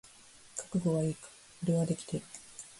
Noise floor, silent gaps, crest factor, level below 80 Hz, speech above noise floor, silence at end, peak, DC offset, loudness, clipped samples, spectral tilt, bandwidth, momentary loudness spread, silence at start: -57 dBFS; none; 16 dB; -66 dBFS; 25 dB; 0 s; -20 dBFS; under 0.1%; -34 LUFS; under 0.1%; -6.5 dB/octave; 11.5 kHz; 19 LU; 0.05 s